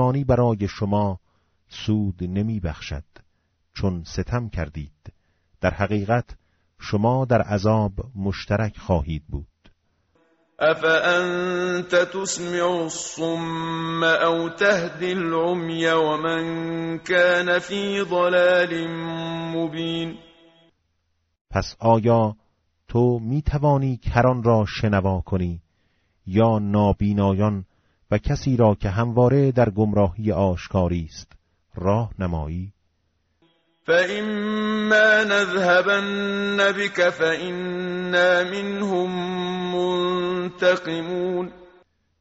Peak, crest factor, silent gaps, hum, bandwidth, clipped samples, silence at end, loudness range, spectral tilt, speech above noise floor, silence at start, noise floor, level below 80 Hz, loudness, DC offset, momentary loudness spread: -4 dBFS; 18 dB; 21.41-21.45 s; none; 8 kHz; under 0.1%; 0.55 s; 7 LU; -5 dB/octave; 50 dB; 0 s; -71 dBFS; -42 dBFS; -22 LUFS; under 0.1%; 11 LU